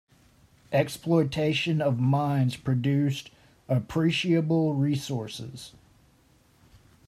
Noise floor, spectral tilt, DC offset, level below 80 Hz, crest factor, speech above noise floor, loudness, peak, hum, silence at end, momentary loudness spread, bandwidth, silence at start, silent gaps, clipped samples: -61 dBFS; -6.5 dB/octave; under 0.1%; -60 dBFS; 18 dB; 36 dB; -26 LUFS; -10 dBFS; none; 1.4 s; 12 LU; 14.5 kHz; 0.7 s; none; under 0.1%